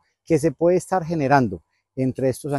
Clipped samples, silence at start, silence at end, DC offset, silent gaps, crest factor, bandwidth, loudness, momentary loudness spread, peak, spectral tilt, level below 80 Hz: under 0.1%; 0.3 s; 0 s; under 0.1%; none; 18 dB; 12.5 kHz; -21 LUFS; 8 LU; -2 dBFS; -7 dB/octave; -54 dBFS